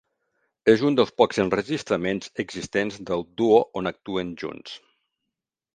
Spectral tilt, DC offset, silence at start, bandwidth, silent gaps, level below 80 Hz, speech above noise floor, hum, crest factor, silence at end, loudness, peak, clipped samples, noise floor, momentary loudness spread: -5.5 dB/octave; under 0.1%; 0.65 s; 9.4 kHz; none; -58 dBFS; 62 dB; none; 22 dB; 0.95 s; -24 LUFS; -2 dBFS; under 0.1%; -85 dBFS; 14 LU